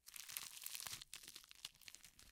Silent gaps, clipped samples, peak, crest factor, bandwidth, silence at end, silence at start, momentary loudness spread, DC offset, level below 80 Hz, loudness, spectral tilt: none; under 0.1%; -20 dBFS; 34 dB; 17.5 kHz; 0 s; 0.05 s; 10 LU; under 0.1%; -80 dBFS; -51 LUFS; 1 dB/octave